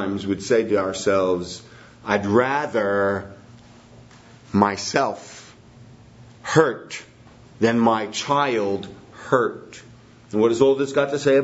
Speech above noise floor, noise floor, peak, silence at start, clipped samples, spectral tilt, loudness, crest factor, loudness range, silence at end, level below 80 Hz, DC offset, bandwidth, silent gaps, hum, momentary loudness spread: 26 dB; -47 dBFS; 0 dBFS; 0 s; under 0.1%; -5 dB/octave; -21 LUFS; 22 dB; 3 LU; 0 s; -60 dBFS; under 0.1%; 8 kHz; none; none; 18 LU